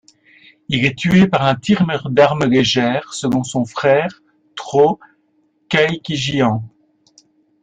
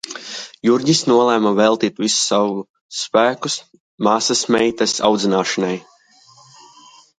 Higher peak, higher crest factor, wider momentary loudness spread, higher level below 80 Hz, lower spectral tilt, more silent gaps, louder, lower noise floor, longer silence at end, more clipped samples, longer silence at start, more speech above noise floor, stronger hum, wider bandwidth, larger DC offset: about the same, -2 dBFS vs 0 dBFS; about the same, 16 dB vs 18 dB; second, 10 LU vs 13 LU; first, -50 dBFS vs -62 dBFS; first, -5.5 dB/octave vs -3.5 dB/octave; second, none vs 2.69-2.74 s, 2.81-2.89 s, 3.80-3.98 s; about the same, -16 LUFS vs -17 LUFS; first, -61 dBFS vs -50 dBFS; second, 0.95 s vs 1.4 s; neither; first, 0.7 s vs 0.05 s; first, 46 dB vs 33 dB; neither; second, 9.4 kHz vs 11 kHz; neither